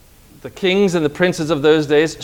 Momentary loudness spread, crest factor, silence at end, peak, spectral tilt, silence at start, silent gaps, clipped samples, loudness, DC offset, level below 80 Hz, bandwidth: 6 LU; 16 dB; 0 s; 0 dBFS; -5.5 dB/octave; 0.45 s; none; under 0.1%; -16 LUFS; under 0.1%; -48 dBFS; 16.5 kHz